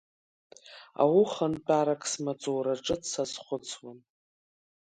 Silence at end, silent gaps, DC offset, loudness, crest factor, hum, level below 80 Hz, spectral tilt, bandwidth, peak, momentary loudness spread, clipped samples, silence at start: 0.9 s; none; under 0.1%; -29 LUFS; 20 dB; none; -66 dBFS; -4.5 dB/octave; 9.4 kHz; -10 dBFS; 20 LU; under 0.1%; 0.65 s